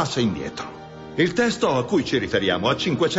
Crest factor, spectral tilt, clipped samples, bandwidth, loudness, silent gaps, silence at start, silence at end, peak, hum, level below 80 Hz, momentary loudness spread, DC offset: 16 dB; -5 dB/octave; under 0.1%; 8 kHz; -22 LUFS; none; 0 s; 0 s; -6 dBFS; none; -50 dBFS; 13 LU; under 0.1%